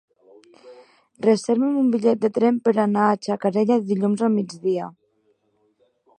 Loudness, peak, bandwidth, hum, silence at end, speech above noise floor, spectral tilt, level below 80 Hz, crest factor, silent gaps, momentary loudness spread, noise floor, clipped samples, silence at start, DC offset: -21 LUFS; -4 dBFS; 9.6 kHz; none; 1.3 s; 46 dB; -7 dB/octave; -74 dBFS; 18 dB; none; 6 LU; -66 dBFS; under 0.1%; 0.65 s; under 0.1%